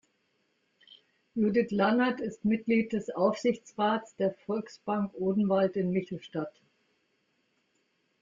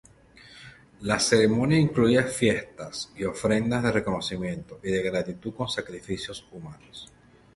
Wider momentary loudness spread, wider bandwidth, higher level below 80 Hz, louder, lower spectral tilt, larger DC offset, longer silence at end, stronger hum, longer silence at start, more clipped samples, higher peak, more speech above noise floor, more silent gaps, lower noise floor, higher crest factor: second, 10 LU vs 22 LU; second, 7.6 kHz vs 12 kHz; second, -68 dBFS vs -52 dBFS; second, -30 LUFS vs -26 LUFS; first, -7 dB/octave vs -5 dB/octave; neither; first, 1.7 s vs 0.5 s; neither; first, 1.35 s vs 0.45 s; neither; second, -12 dBFS vs -6 dBFS; first, 46 dB vs 27 dB; neither; first, -74 dBFS vs -52 dBFS; about the same, 18 dB vs 20 dB